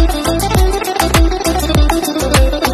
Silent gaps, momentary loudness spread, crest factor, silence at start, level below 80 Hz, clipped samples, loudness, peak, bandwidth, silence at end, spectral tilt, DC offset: none; 3 LU; 12 dB; 0 s; -16 dBFS; under 0.1%; -13 LUFS; 0 dBFS; 14 kHz; 0 s; -4.5 dB/octave; under 0.1%